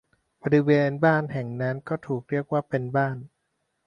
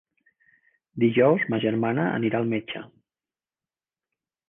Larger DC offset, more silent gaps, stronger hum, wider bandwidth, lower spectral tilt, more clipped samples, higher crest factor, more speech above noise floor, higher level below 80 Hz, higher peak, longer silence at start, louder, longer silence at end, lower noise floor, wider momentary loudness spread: neither; neither; neither; first, 6.8 kHz vs 3.8 kHz; about the same, -9 dB/octave vs -10 dB/octave; neither; about the same, 20 dB vs 20 dB; second, 52 dB vs over 67 dB; about the same, -64 dBFS vs -68 dBFS; about the same, -6 dBFS vs -8 dBFS; second, 0.45 s vs 0.95 s; about the same, -25 LUFS vs -23 LUFS; second, 0.6 s vs 1.6 s; second, -76 dBFS vs under -90 dBFS; second, 11 LU vs 16 LU